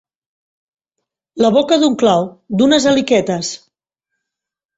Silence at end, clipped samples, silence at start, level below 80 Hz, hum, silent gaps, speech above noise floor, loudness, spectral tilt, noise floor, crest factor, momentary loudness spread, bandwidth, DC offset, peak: 1.2 s; under 0.1%; 1.35 s; -54 dBFS; none; none; 71 dB; -14 LUFS; -4.5 dB/octave; -84 dBFS; 16 dB; 11 LU; 8 kHz; under 0.1%; 0 dBFS